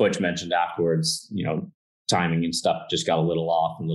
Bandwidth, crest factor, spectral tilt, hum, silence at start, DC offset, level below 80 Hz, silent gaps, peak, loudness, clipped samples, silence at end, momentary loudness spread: 12.5 kHz; 16 dB; -4.5 dB/octave; none; 0 s; under 0.1%; -60 dBFS; 1.74-2.05 s; -8 dBFS; -24 LUFS; under 0.1%; 0 s; 6 LU